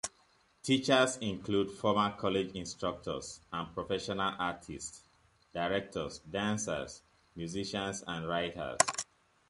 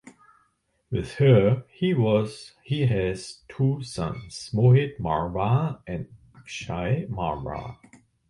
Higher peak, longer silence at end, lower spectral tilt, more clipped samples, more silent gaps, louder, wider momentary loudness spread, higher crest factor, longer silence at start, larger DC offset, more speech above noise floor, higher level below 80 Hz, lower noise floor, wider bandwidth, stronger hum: about the same, -4 dBFS vs -6 dBFS; about the same, 0.45 s vs 0.55 s; second, -3.5 dB/octave vs -7.5 dB/octave; neither; neither; second, -34 LUFS vs -25 LUFS; second, 13 LU vs 17 LU; first, 32 dB vs 18 dB; about the same, 0.05 s vs 0.05 s; neither; second, 34 dB vs 46 dB; second, -62 dBFS vs -48 dBFS; about the same, -68 dBFS vs -70 dBFS; about the same, 11.5 kHz vs 11 kHz; neither